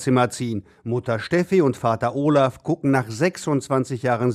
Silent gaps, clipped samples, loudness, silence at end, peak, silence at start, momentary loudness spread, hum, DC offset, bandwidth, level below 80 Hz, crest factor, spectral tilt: none; under 0.1%; -22 LUFS; 0 s; -6 dBFS; 0 s; 8 LU; none; under 0.1%; 14 kHz; -58 dBFS; 16 dB; -6.5 dB/octave